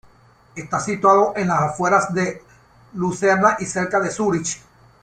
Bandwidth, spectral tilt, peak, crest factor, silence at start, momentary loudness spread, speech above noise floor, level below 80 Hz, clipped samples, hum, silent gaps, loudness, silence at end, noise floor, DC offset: 10 kHz; -5 dB/octave; -2 dBFS; 18 dB; 0.55 s; 17 LU; 33 dB; -56 dBFS; under 0.1%; none; none; -19 LUFS; 0.45 s; -52 dBFS; under 0.1%